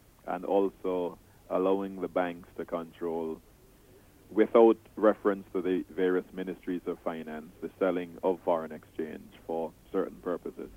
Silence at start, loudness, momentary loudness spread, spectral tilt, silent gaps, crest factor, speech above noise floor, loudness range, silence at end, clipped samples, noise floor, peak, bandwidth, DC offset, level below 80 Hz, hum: 0.25 s; -31 LUFS; 13 LU; -7.5 dB/octave; none; 22 dB; 27 dB; 6 LU; 0 s; under 0.1%; -57 dBFS; -8 dBFS; 16 kHz; under 0.1%; -64 dBFS; none